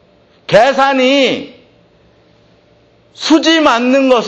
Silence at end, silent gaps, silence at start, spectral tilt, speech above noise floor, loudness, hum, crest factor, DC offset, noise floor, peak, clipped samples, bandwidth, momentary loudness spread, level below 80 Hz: 0 s; none; 0.5 s; -3.5 dB/octave; 39 dB; -11 LUFS; none; 12 dB; under 0.1%; -49 dBFS; 0 dBFS; under 0.1%; 8.6 kHz; 11 LU; -52 dBFS